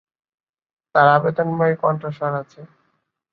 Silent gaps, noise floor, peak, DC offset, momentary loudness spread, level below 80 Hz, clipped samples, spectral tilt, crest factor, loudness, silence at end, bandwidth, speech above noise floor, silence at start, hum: none; -69 dBFS; -2 dBFS; under 0.1%; 11 LU; -64 dBFS; under 0.1%; -9 dB/octave; 20 dB; -19 LUFS; 0.65 s; 6 kHz; 51 dB; 0.95 s; none